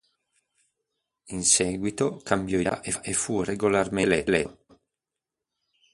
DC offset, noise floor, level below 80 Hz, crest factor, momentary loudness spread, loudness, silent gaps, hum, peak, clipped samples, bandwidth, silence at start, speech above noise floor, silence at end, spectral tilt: under 0.1%; -88 dBFS; -54 dBFS; 22 dB; 8 LU; -25 LUFS; none; none; -6 dBFS; under 0.1%; 11.5 kHz; 1.25 s; 62 dB; 1.4 s; -3.5 dB/octave